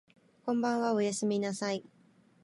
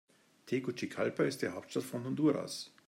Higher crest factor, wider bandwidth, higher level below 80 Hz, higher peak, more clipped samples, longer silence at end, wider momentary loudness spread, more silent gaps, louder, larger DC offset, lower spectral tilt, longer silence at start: about the same, 16 dB vs 18 dB; second, 11.5 kHz vs 16 kHz; about the same, -82 dBFS vs -82 dBFS; about the same, -18 dBFS vs -18 dBFS; neither; first, 0.6 s vs 0.2 s; about the same, 8 LU vs 7 LU; neither; first, -32 LUFS vs -36 LUFS; neither; about the same, -5 dB/octave vs -5.5 dB/octave; about the same, 0.45 s vs 0.45 s